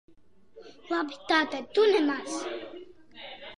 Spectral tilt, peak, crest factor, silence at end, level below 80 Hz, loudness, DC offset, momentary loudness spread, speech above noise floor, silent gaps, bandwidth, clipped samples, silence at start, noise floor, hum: -2.5 dB/octave; -12 dBFS; 18 dB; 0.05 s; -72 dBFS; -27 LUFS; 0.2%; 21 LU; 32 dB; none; 11 kHz; under 0.1%; 0.55 s; -59 dBFS; none